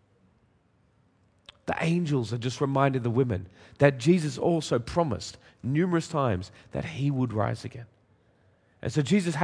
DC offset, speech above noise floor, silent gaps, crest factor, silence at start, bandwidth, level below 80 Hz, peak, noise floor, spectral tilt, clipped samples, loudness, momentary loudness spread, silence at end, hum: under 0.1%; 39 dB; none; 24 dB; 1.7 s; 10.5 kHz; -56 dBFS; -4 dBFS; -66 dBFS; -6.5 dB/octave; under 0.1%; -27 LUFS; 13 LU; 0 s; none